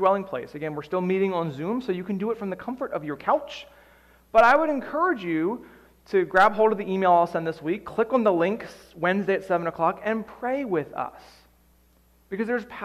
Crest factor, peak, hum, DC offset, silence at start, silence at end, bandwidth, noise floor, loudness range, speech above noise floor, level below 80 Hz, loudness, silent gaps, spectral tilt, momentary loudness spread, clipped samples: 18 dB; -8 dBFS; none; under 0.1%; 0 s; 0 s; 14 kHz; -60 dBFS; 6 LU; 36 dB; -60 dBFS; -25 LUFS; none; -7 dB/octave; 14 LU; under 0.1%